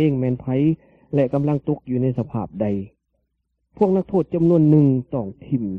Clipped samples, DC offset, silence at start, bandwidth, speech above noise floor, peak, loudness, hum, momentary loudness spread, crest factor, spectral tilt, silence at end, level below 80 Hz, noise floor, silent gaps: under 0.1%; under 0.1%; 0 s; 3.7 kHz; 53 dB; -4 dBFS; -21 LUFS; none; 12 LU; 16 dB; -11.5 dB/octave; 0 s; -52 dBFS; -73 dBFS; none